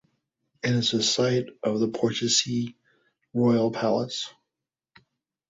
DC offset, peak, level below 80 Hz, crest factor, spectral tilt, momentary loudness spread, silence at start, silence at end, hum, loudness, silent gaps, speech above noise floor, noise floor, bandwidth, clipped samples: under 0.1%; -8 dBFS; -66 dBFS; 18 dB; -4 dB/octave; 10 LU; 0.65 s; 1.2 s; none; -25 LUFS; none; 63 dB; -87 dBFS; 8 kHz; under 0.1%